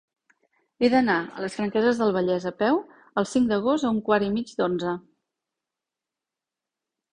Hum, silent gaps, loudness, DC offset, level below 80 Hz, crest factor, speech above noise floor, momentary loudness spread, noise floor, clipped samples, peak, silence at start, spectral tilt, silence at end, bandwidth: none; none; -24 LUFS; under 0.1%; -62 dBFS; 20 dB; 65 dB; 7 LU; -88 dBFS; under 0.1%; -6 dBFS; 0.8 s; -6 dB/octave; 2.15 s; 10.5 kHz